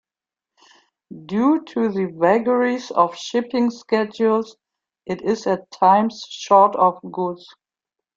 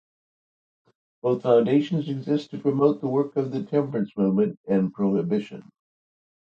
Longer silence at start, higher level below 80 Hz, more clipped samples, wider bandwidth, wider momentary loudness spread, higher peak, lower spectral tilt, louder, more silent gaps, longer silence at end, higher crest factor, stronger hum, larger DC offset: second, 1.1 s vs 1.25 s; about the same, -66 dBFS vs -68 dBFS; neither; about the same, 7.6 kHz vs 7.2 kHz; first, 11 LU vs 8 LU; first, 0 dBFS vs -8 dBFS; second, -6 dB/octave vs -9 dB/octave; first, -19 LUFS vs -24 LUFS; second, none vs 4.57-4.64 s; second, 0.8 s vs 0.95 s; about the same, 20 dB vs 18 dB; neither; neither